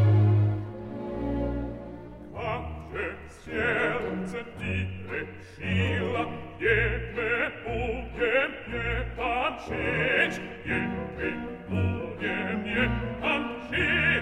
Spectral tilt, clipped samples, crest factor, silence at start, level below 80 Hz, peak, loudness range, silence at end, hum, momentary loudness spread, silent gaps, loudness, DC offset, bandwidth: -7 dB/octave; under 0.1%; 18 dB; 0 s; -42 dBFS; -10 dBFS; 4 LU; 0 s; none; 12 LU; none; -28 LUFS; under 0.1%; 9.4 kHz